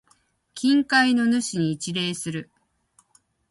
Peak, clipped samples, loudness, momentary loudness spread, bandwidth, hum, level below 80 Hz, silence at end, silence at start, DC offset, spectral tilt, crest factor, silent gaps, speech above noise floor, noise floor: -8 dBFS; under 0.1%; -22 LUFS; 14 LU; 11.5 kHz; none; -66 dBFS; 1.05 s; 0.55 s; under 0.1%; -4 dB/octave; 18 dB; none; 42 dB; -64 dBFS